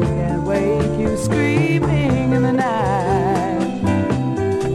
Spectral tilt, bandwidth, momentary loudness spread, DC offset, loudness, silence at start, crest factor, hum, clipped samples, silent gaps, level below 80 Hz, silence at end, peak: -7 dB/octave; 12.5 kHz; 3 LU; under 0.1%; -18 LUFS; 0 s; 14 dB; none; under 0.1%; none; -36 dBFS; 0 s; -4 dBFS